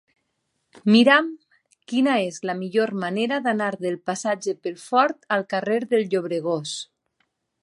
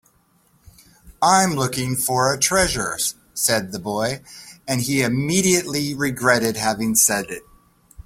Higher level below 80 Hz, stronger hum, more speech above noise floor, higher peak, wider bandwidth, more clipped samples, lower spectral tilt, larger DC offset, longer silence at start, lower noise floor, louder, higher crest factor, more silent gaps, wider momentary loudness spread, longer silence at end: second, -76 dBFS vs -48 dBFS; neither; first, 53 dB vs 40 dB; about the same, -2 dBFS vs -2 dBFS; second, 11.5 kHz vs 16.5 kHz; neither; first, -4.5 dB/octave vs -3 dB/octave; neither; second, 0.75 s vs 1.05 s; first, -75 dBFS vs -60 dBFS; second, -22 LUFS vs -19 LUFS; about the same, 20 dB vs 20 dB; neither; about the same, 12 LU vs 10 LU; first, 0.8 s vs 0.05 s